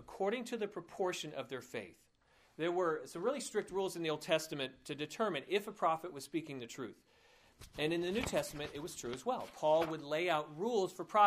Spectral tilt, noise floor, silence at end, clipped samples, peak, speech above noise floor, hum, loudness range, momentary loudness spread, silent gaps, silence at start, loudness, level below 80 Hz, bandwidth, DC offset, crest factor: -4 dB/octave; -70 dBFS; 0 s; under 0.1%; -16 dBFS; 33 dB; none; 4 LU; 10 LU; none; 0 s; -38 LUFS; -68 dBFS; 15.5 kHz; under 0.1%; 22 dB